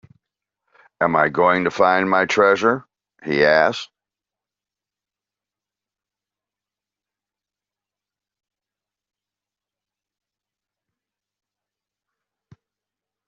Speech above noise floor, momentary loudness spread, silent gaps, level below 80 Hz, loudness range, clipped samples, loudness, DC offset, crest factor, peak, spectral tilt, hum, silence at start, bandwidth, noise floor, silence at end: 72 dB; 12 LU; none; -66 dBFS; 6 LU; under 0.1%; -17 LUFS; under 0.1%; 22 dB; -2 dBFS; -3 dB/octave; none; 1 s; 7.6 kHz; -89 dBFS; 9.45 s